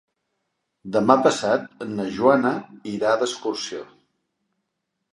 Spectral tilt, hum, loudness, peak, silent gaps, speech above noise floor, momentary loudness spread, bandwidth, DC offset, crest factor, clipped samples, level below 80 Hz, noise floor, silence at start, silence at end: -4.5 dB/octave; none; -22 LUFS; 0 dBFS; none; 57 dB; 14 LU; 11.5 kHz; under 0.1%; 24 dB; under 0.1%; -66 dBFS; -79 dBFS; 0.85 s; 1.3 s